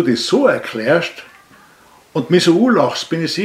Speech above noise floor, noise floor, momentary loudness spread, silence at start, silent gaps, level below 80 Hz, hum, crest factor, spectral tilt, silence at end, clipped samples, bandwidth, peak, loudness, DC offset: 33 dB; -47 dBFS; 12 LU; 0 s; none; -62 dBFS; none; 16 dB; -5 dB/octave; 0 s; under 0.1%; 14.5 kHz; 0 dBFS; -15 LUFS; under 0.1%